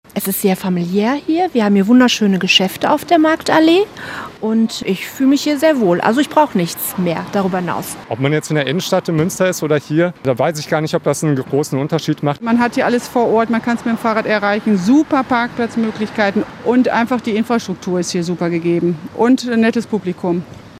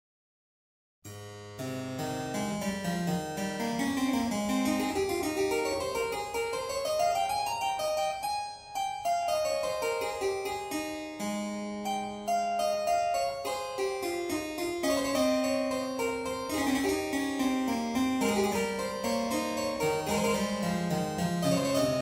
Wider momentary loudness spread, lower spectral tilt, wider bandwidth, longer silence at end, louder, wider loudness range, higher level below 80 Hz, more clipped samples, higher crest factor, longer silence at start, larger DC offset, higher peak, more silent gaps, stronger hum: about the same, 7 LU vs 7 LU; about the same, -5 dB/octave vs -4.5 dB/octave; about the same, 16 kHz vs 16 kHz; about the same, 0 s vs 0 s; first, -16 LUFS vs -31 LUFS; about the same, 4 LU vs 3 LU; about the same, -56 dBFS vs -58 dBFS; neither; about the same, 16 dB vs 16 dB; second, 0.15 s vs 1.05 s; neither; first, 0 dBFS vs -14 dBFS; neither; neither